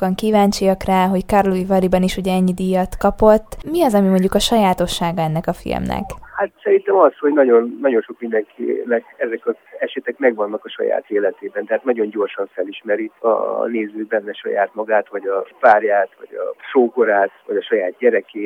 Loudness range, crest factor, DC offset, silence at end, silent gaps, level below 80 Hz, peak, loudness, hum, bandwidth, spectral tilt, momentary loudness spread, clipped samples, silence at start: 5 LU; 16 dB; under 0.1%; 0 s; none; -40 dBFS; 0 dBFS; -18 LUFS; none; 17.5 kHz; -6 dB/octave; 10 LU; under 0.1%; 0 s